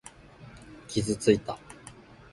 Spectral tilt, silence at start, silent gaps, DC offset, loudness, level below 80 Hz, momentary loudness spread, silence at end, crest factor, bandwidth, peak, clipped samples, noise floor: -5 dB/octave; 0.4 s; none; under 0.1%; -28 LUFS; -54 dBFS; 24 LU; 0.4 s; 24 dB; 11.5 kHz; -8 dBFS; under 0.1%; -50 dBFS